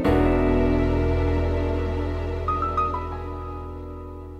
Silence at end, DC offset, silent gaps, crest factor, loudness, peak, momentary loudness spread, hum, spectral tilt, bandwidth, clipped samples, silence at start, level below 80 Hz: 0 s; under 0.1%; none; 16 dB; -24 LUFS; -8 dBFS; 15 LU; none; -9 dB/octave; 6.8 kHz; under 0.1%; 0 s; -30 dBFS